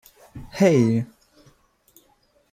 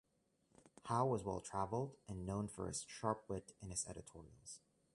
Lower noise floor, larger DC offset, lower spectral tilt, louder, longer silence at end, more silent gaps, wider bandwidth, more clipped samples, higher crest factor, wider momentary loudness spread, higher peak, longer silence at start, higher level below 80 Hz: second, -62 dBFS vs -80 dBFS; neither; first, -7 dB/octave vs -5.5 dB/octave; first, -20 LUFS vs -44 LUFS; first, 1.45 s vs 0.4 s; neither; first, 15.5 kHz vs 11.5 kHz; neither; about the same, 20 dB vs 22 dB; first, 26 LU vs 17 LU; first, -4 dBFS vs -22 dBFS; second, 0.35 s vs 0.65 s; first, -56 dBFS vs -64 dBFS